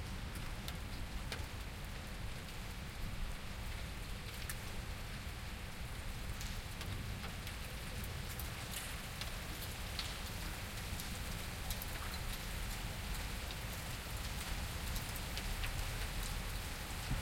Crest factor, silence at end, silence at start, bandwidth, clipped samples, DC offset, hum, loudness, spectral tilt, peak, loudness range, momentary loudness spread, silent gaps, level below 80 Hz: 20 dB; 0 s; 0 s; 16.5 kHz; under 0.1%; under 0.1%; none; -44 LUFS; -3.5 dB/octave; -22 dBFS; 4 LU; 5 LU; none; -46 dBFS